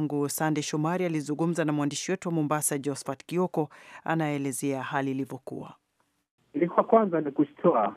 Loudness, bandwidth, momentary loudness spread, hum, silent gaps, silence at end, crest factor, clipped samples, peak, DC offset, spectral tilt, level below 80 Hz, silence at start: -28 LUFS; 15.5 kHz; 13 LU; none; 6.31-6.38 s; 0 s; 22 dB; under 0.1%; -6 dBFS; under 0.1%; -5.5 dB/octave; -78 dBFS; 0 s